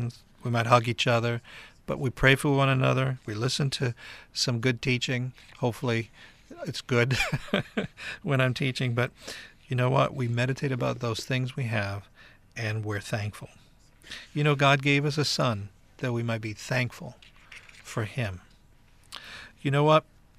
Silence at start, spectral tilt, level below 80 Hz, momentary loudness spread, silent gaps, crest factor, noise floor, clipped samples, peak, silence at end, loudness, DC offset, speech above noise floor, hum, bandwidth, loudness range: 0 s; -5.5 dB/octave; -52 dBFS; 20 LU; none; 24 dB; -57 dBFS; under 0.1%; -6 dBFS; 0.4 s; -27 LUFS; under 0.1%; 30 dB; none; 14 kHz; 7 LU